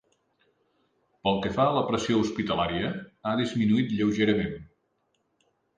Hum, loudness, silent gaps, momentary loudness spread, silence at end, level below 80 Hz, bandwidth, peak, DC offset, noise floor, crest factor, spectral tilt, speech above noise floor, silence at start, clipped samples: none; -27 LUFS; none; 7 LU; 1.15 s; -54 dBFS; 9.2 kHz; -10 dBFS; under 0.1%; -74 dBFS; 18 dB; -6 dB/octave; 48 dB; 1.25 s; under 0.1%